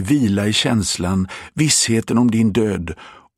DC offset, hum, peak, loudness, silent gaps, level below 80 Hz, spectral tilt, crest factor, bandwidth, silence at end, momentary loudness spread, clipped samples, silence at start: under 0.1%; none; -2 dBFS; -17 LUFS; none; -44 dBFS; -4 dB/octave; 14 dB; 15 kHz; 0.25 s; 11 LU; under 0.1%; 0 s